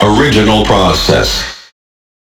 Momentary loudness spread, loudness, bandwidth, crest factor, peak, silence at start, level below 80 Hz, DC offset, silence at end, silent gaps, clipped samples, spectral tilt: 7 LU; -9 LUFS; 20 kHz; 10 dB; 0 dBFS; 0 s; -24 dBFS; under 0.1%; 0.8 s; none; under 0.1%; -4.5 dB/octave